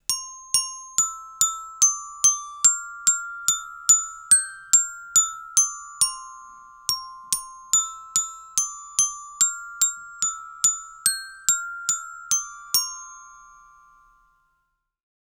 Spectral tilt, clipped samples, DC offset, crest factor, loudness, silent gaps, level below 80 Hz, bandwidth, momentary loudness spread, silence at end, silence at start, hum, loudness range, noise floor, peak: 3.5 dB/octave; under 0.1%; under 0.1%; 26 dB; -21 LUFS; none; -64 dBFS; over 20 kHz; 9 LU; 1.9 s; 0.1 s; none; 6 LU; -74 dBFS; 0 dBFS